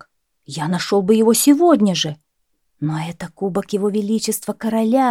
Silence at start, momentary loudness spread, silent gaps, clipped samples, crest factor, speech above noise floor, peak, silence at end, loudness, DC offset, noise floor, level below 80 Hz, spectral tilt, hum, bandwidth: 0.5 s; 13 LU; none; under 0.1%; 16 dB; 54 dB; -2 dBFS; 0 s; -18 LUFS; under 0.1%; -71 dBFS; -60 dBFS; -5 dB/octave; none; 16.5 kHz